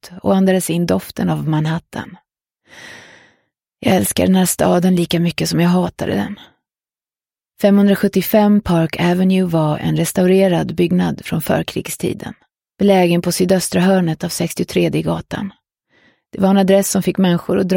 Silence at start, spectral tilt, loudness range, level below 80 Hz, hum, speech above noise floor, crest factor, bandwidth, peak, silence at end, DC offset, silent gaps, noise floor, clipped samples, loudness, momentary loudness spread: 0.05 s; -6 dB/octave; 4 LU; -48 dBFS; none; over 75 dB; 16 dB; 17 kHz; -2 dBFS; 0 s; under 0.1%; none; under -90 dBFS; under 0.1%; -16 LUFS; 11 LU